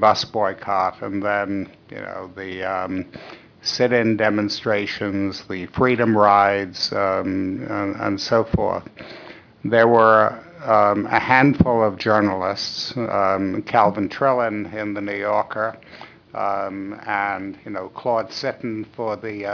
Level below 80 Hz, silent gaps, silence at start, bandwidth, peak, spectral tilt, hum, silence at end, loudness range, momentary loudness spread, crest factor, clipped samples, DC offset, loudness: -48 dBFS; none; 0 s; 5.4 kHz; -2 dBFS; -6 dB/octave; none; 0 s; 8 LU; 16 LU; 18 dB; under 0.1%; under 0.1%; -20 LUFS